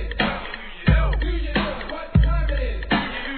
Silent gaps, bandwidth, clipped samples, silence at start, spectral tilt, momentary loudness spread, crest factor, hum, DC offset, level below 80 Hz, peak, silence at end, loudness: none; 4.5 kHz; under 0.1%; 0 s; -9.5 dB/octave; 8 LU; 16 dB; none; 0.2%; -24 dBFS; -6 dBFS; 0 s; -23 LUFS